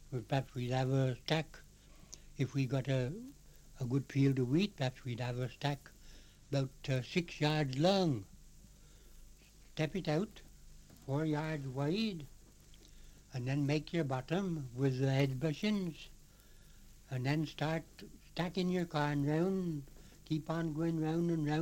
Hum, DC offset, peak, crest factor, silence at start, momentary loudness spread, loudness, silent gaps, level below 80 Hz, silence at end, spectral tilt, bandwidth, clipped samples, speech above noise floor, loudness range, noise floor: 50 Hz at -60 dBFS; under 0.1%; -16 dBFS; 22 dB; 0 s; 13 LU; -36 LUFS; none; -58 dBFS; 0 s; -6.5 dB/octave; 16.5 kHz; under 0.1%; 24 dB; 4 LU; -59 dBFS